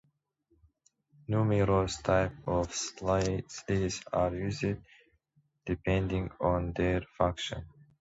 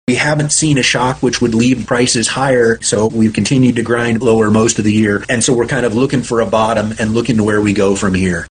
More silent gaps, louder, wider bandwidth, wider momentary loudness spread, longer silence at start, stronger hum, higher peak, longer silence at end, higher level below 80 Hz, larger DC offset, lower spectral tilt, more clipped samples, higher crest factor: neither; second, -31 LUFS vs -13 LUFS; second, 8 kHz vs 10 kHz; first, 9 LU vs 3 LU; first, 1.3 s vs 0.1 s; neither; second, -12 dBFS vs 0 dBFS; first, 0.3 s vs 0.1 s; second, -46 dBFS vs -40 dBFS; neither; about the same, -5.5 dB/octave vs -4.5 dB/octave; neither; first, 20 dB vs 12 dB